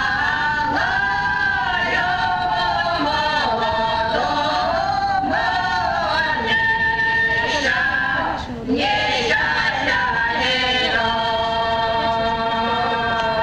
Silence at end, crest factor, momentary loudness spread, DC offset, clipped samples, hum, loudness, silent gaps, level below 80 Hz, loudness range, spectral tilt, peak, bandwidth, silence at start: 0 s; 14 dB; 3 LU; under 0.1%; under 0.1%; none; -19 LUFS; none; -40 dBFS; 1 LU; -4 dB/octave; -6 dBFS; 10.5 kHz; 0 s